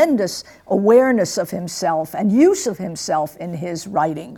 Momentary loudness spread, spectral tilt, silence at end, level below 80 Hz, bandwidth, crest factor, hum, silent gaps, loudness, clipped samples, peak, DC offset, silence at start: 13 LU; -5 dB/octave; 0 s; -58 dBFS; 18.5 kHz; 16 dB; none; none; -18 LUFS; under 0.1%; -2 dBFS; under 0.1%; 0 s